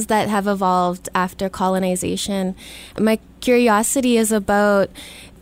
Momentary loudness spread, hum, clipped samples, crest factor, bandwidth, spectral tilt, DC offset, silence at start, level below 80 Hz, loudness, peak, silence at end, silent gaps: 9 LU; none; under 0.1%; 16 dB; 16.5 kHz; -4.5 dB/octave; under 0.1%; 0 s; -46 dBFS; -19 LUFS; -4 dBFS; 0.15 s; none